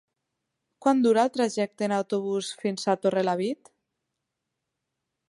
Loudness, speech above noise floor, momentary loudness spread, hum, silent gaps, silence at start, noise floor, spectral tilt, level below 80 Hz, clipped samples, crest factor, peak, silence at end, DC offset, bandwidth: -26 LUFS; 58 dB; 8 LU; none; none; 0.8 s; -83 dBFS; -5 dB/octave; -80 dBFS; under 0.1%; 20 dB; -8 dBFS; 1.75 s; under 0.1%; 11.5 kHz